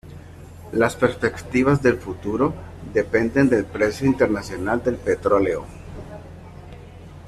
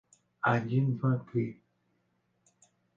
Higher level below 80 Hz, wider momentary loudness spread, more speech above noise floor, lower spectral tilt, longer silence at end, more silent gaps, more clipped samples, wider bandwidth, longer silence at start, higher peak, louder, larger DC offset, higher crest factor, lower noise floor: first, -44 dBFS vs -70 dBFS; first, 23 LU vs 6 LU; second, 20 dB vs 46 dB; second, -7 dB/octave vs -8.5 dB/octave; second, 0 s vs 1.45 s; neither; neither; first, 13.5 kHz vs 7.6 kHz; second, 0.05 s vs 0.45 s; first, -4 dBFS vs -12 dBFS; first, -21 LUFS vs -31 LUFS; neither; about the same, 18 dB vs 20 dB; second, -40 dBFS vs -75 dBFS